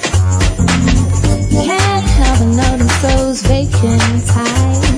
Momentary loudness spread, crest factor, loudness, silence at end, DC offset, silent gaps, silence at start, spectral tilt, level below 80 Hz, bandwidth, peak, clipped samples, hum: 2 LU; 10 dB; -12 LUFS; 0 s; under 0.1%; none; 0 s; -5 dB/octave; -18 dBFS; 11 kHz; 0 dBFS; under 0.1%; none